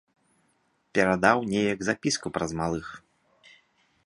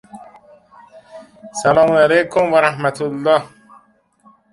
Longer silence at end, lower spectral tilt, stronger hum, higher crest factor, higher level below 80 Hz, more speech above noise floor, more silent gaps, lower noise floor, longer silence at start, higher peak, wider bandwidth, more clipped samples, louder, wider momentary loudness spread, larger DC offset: about the same, 1.1 s vs 1.05 s; about the same, -4.5 dB/octave vs -5 dB/octave; neither; first, 26 dB vs 18 dB; about the same, -56 dBFS vs -56 dBFS; first, 44 dB vs 39 dB; neither; first, -70 dBFS vs -54 dBFS; first, 0.95 s vs 0.15 s; second, -4 dBFS vs 0 dBFS; about the same, 11.5 kHz vs 11.5 kHz; neither; second, -26 LUFS vs -15 LUFS; about the same, 9 LU vs 9 LU; neither